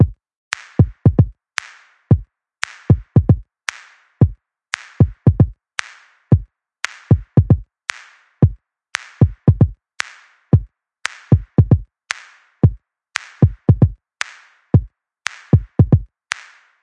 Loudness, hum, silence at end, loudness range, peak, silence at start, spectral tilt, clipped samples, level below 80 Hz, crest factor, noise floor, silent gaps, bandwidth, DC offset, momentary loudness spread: -18 LUFS; none; 0.8 s; 1 LU; 0 dBFS; 0 s; -7 dB/octave; under 0.1%; -32 dBFS; 18 dB; -44 dBFS; 0.37-0.51 s; 10.5 kHz; under 0.1%; 13 LU